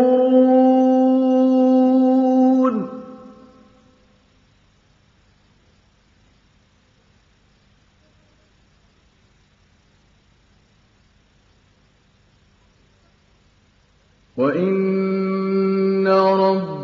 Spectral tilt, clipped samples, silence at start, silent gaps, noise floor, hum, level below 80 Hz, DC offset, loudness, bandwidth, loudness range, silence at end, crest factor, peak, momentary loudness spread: -9 dB/octave; under 0.1%; 0 s; none; -58 dBFS; none; -64 dBFS; under 0.1%; -17 LUFS; 6.2 kHz; 13 LU; 0 s; 16 dB; -4 dBFS; 8 LU